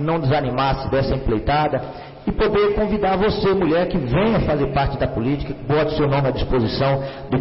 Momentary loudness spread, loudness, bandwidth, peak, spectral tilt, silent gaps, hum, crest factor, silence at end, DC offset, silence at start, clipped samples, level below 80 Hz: 5 LU; -20 LUFS; 5.8 kHz; -10 dBFS; -11.5 dB/octave; none; none; 10 dB; 0 s; under 0.1%; 0 s; under 0.1%; -32 dBFS